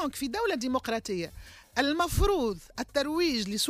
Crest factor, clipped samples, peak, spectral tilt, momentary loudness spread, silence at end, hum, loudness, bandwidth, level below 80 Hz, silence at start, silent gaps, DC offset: 16 dB; under 0.1%; -14 dBFS; -4 dB/octave; 9 LU; 0 s; none; -29 LUFS; 15.5 kHz; -40 dBFS; 0 s; none; under 0.1%